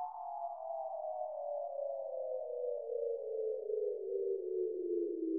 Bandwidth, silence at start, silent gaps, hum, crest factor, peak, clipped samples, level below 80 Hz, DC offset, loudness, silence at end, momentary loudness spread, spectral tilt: 1.4 kHz; 0 s; none; none; 12 dB; -26 dBFS; under 0.1%; -88 dBFS; under 0.1%; -40 LUFS; 0 s; 5 LU; -4.5 dB/octave